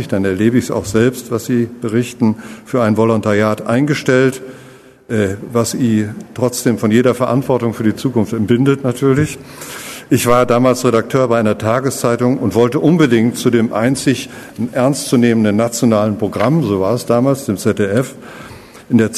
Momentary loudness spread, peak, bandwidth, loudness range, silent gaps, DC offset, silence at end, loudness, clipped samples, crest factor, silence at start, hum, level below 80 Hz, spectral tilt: 9 LU; 0 dBFS; 13.5 kHz; 2 LU; none; under 0.1%; 0 s; -15 LUFS; under 0.1%; 14 dB; 0 s; none; -48 dBFS; -6 dB/octave